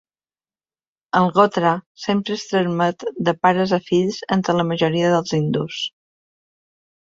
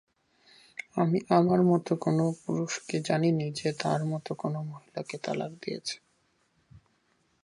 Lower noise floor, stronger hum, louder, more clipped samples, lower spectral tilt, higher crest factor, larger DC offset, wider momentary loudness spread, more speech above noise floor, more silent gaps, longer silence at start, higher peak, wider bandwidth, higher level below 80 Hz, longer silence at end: first, under -90 dBFS vs -71 dBFS; neither; first, -20 LUFS vs -29 LUFS; neither; about the same, -6 dB/octave vs -6.5 dB/octave; about the same, 18 dB vs 22 dB; neither; second, 7 LU vs 14 LU; first, over 71 dB vs 43 dB; first, 1.86-1.95 s vs none; first, 1.15 s vs 0.95 s; first, -2 dBFS vs -8 dBFS; second, 7.8 kHz vs 11 kHz; first, -60 dBFS vs -70 dBFS; first, 1.15 s vs 0.65 s